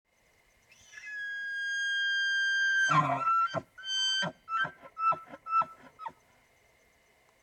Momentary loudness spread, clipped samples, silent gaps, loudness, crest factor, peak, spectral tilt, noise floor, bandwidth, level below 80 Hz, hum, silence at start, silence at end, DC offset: 15 LU; under 0.1%; none; -29 LUFS; 20 dB; -14 dBFS; -2 dB/octave; -68 dBFS; 12 kHz; -76 dBFS; none; 0.9 s; 1.3 s; under 0.1%